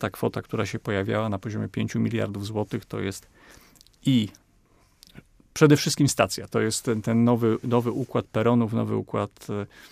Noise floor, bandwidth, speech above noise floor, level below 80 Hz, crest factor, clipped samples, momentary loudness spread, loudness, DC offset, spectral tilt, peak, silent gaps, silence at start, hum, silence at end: -61 dBFS; 15.5 kHz; 36 dB; -58 dBFS; 22 dB; under 0.1%; 11 LU; -25 LUFS; under 0.1%; -5.5 dB/octave; -4 dBFS; none; 0 s; none; 0.05 s